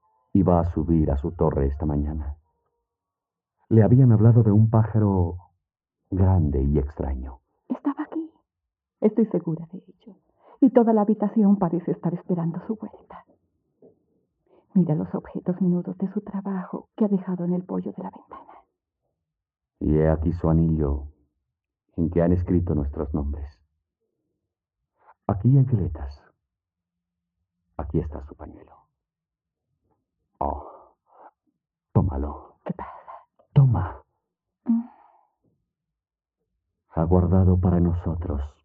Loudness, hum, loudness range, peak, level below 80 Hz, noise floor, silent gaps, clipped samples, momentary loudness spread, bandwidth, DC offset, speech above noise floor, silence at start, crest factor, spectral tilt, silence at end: -23 LUFS; none; 12 LU; -4 dBFS; -38 dBFS; -88 dBFS; none; under 0.1%; 18 LU; 3.2 kHz; under 0.1%; 66 dB; 0.35 s; 22 dB; -13 dB/octave; 0.15 s